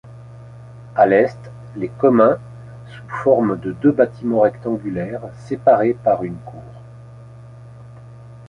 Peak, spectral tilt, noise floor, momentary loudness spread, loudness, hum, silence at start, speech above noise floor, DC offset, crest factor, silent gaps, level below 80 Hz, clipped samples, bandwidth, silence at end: 0 dBFS; -9 dB/octave; -39 dBFS; 24 LU; -18 LUFS; none; 0.05 s; 22 dB; under 0.1%; 18 dB; none; -52 dBFS; under 0.1%; 9.8 kHz; 0 s